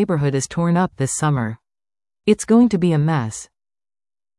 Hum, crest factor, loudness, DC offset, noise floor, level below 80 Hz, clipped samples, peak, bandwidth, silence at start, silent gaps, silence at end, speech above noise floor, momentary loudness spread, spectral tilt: none; 16 dB; -19 LUFS; under 0.1%; under -90 dBFS; -52 dBFS; under 0.1%; -4 dBFS; 12 kHz; 0 s; none; 0.95 s; over 72 dB; 14 LU; -6 dB/octave